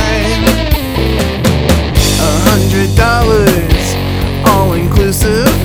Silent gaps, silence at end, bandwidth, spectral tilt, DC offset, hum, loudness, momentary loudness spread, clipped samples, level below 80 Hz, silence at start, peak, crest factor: none; 0 s; 19.5 kHz; -5 dB/octave; under 0.1%; none; -11 LUFS; 4 LU; 1%; -16 dBFS; 0 s; 0 dBFS; 10 dB